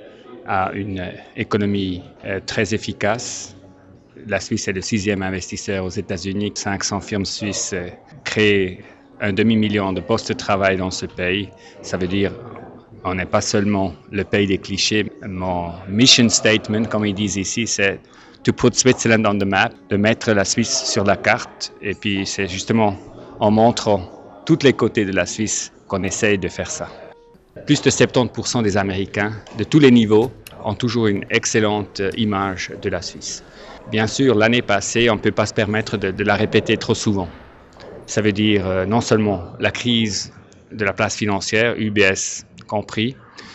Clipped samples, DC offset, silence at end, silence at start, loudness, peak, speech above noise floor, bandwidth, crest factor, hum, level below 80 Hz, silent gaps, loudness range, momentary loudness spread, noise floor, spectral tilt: under 0.1%; under 0.1%; 0 s; 0 s; -19 LUFS; 0 dBFS; 27 dB; 8.6 kHz; 20 dB; none; -50 dBFS; none; 6 LU; 12 LU; -46 dBFS; -4 dB/octave